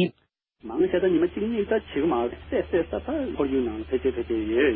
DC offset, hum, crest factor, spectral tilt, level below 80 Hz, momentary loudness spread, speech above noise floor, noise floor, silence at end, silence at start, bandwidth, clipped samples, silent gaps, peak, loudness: under 0.1%; none; 14 dB; -11 dB/octave; -46 dBFS; 6 LU; 44 dB; -69 dBFS; 0 s; 0 s; 4.5 kHz; under 0.1%; none; -10 dBFS; -26 LUFS